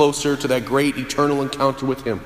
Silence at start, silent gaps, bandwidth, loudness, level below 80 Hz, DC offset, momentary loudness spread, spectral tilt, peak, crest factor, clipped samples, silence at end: 0 s; none; 15.5 kHz; -20 LUFS; -46 dBFS; under 0.1%; 3 LU; -4.5 dB/octave; -2 dBFS; 16 dB; under 0.1%; 0 s